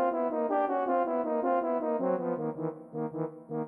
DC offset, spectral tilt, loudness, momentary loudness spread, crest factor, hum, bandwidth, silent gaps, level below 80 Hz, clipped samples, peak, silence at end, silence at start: under 0.1%; -10.5 dB/octave; -31 LUFS; 8 LU; 14 dB; none; 3.7 kHz; none; -80 dBFS; under 0.1%; -16 dBFS; 0 s; 0 s